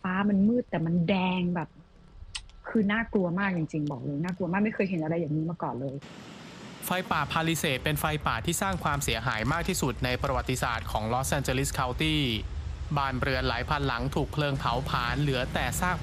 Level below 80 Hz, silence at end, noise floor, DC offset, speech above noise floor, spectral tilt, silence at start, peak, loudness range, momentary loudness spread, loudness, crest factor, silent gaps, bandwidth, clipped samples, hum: -42 dBFS; 0 s; -48 dBFS; under 0.1%; 20 dB; -5 dB/octave; 0.05 s; -10 dBFS; 2 LU; 9 LU; -29 LUFS; 20 dB; none; 14.5 kHz; under 0.1%; none